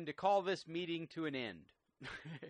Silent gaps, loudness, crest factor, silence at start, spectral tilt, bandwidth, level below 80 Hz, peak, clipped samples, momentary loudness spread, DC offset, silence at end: none; -40 LUFS; 20 dB; 0 s; -5.5 dB/octave; 10 kHz; -76 dBFS; -20 dBFS; under 0.1%; 16 LU; under 0.1%; 0 s